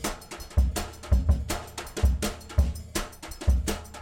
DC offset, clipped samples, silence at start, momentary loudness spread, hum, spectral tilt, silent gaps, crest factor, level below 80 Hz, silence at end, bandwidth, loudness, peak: under 0.1%; under 0.1%; 0 s; 8 LU; none; -5 dB/octave; none; 16 dB; -28 dBFS; 0 s; 16.5 kHz; -29 LUFS; -10 dBFS